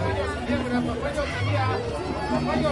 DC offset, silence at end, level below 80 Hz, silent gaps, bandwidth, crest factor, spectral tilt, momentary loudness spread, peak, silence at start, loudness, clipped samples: under 0.1%; 0 s; -40 dBFS; none; 11.5 kHz; 14 dB; -6.5 dB/octave; 4 LU; -12 dBFS; 0 s; -26 LUFS; under 0.1%